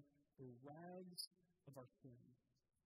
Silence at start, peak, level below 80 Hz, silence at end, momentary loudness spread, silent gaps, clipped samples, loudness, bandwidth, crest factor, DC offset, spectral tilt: 0 s; -36 dBFS; under -90 dBFS; 0.5 s; 12 LU; 1.27-1.31 s; under 0.1%; -58 LUFS; 11.5 kHz; 26 dB; under 0.1%; -4 dB/octave